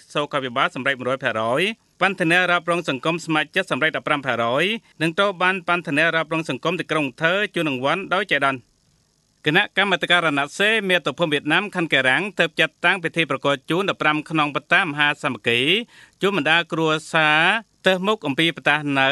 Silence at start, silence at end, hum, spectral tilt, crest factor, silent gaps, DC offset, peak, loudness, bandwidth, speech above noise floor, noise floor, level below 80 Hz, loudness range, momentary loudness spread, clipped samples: 0.1 s; 0 s; none; -4.5 dB/octave; 20 dB; none; under 0.1%; -2 dBFS; -20 LUFS; 12 kHz; 42 dB; -63 dBFS; -66 dBFS; 2 LU; 6 LU; under 0.1%